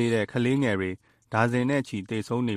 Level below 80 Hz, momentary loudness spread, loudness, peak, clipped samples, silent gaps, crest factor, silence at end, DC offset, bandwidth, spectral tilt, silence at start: -62 dBFS; 8 LU; -27 LUFS; -8 dBFS; under 0.1%; none; 18 dB; 0 s; under 0.1%; 13.5 kHz; -6.5 dB/octave; 0 s